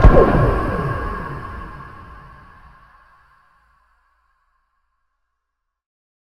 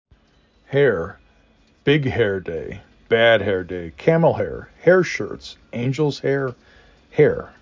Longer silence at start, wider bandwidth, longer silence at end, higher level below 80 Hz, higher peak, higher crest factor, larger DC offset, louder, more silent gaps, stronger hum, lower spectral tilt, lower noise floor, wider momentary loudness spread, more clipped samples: second, 0 s vs 0.7 s; second, 5.8 kHz vs 7.6 kHz; first, 4.1 s vs 0.1 s; first, -24 dBFS vs -48 dBFS; about the same, 0 dBFS vs -2 dBFS; about the same, 20 dB vs 18 dB; neither; about the same, -19 LUFS vs -20 LUFS; neither; neither; first, -9 dB/octave vs -6.5 dB/octave; first, -77 dBFS vs -58 dBFS; first, 27 LU vs 15 LU; first, 0.2% vs under 0.1%